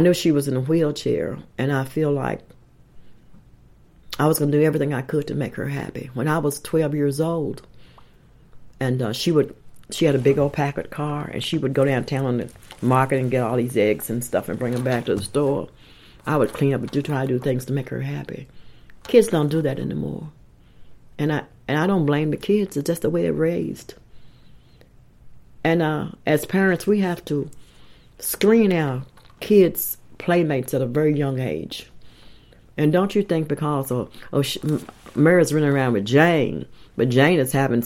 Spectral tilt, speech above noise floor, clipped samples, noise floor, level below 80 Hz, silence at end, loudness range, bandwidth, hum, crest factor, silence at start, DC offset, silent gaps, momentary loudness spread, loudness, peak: -6 dB/octave; 30 dB; under 0.1%; -51 dBFS; -52 dBFS; 0 s; 5 LU; 16.5 kHz; none; 20 dB; 0 s; under 0.1%; none; 12 LU; -22 LUFS; -2 dBFS